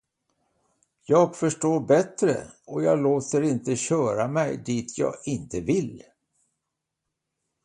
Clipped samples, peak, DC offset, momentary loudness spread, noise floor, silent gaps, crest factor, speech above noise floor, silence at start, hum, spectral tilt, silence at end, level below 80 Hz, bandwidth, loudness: under 0.1%; -6 dBFS; under 0.1%; 9 LU; -83 dBFS; none; 18 dB; 59 dB; 1.1 s; none; -6 dB/octave; 1.65 s; -60 dBFS; 11 kHz; -25 LUFS